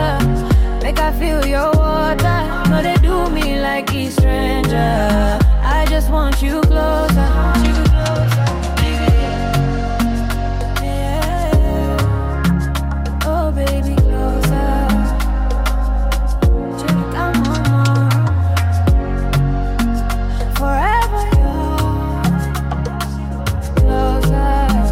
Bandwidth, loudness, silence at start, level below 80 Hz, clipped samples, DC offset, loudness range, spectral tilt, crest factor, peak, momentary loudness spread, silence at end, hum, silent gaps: 16 kHz; -16 LUFS; 0 s; -18 dBFS; under 0.1%; under 0.1%; 3 LU; -6.5 dB/octave; 10 dB; -4 dBFS; 5 LU; 0 s; none; none